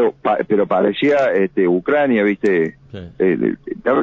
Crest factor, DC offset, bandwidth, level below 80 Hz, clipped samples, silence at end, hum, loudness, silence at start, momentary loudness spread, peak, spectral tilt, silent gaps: 14 dB; under 0.1%; 8 kHz; -52 dBFS; under 0.1%; 0 s; none; -17 LUFS; 0 s; 7 LU; -4 dBFS; -7.5 dB/octave; none